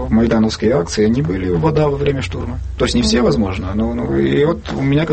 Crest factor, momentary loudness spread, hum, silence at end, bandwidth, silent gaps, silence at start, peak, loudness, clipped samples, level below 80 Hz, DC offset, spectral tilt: 12 dB; 6 LU; none; 0 s; 8.8 kHz; none; 0 s; -2 dBFS; -16 LUFS; under 0.1%; -28 dBFS; under 0.1%; -6.5 dB/octave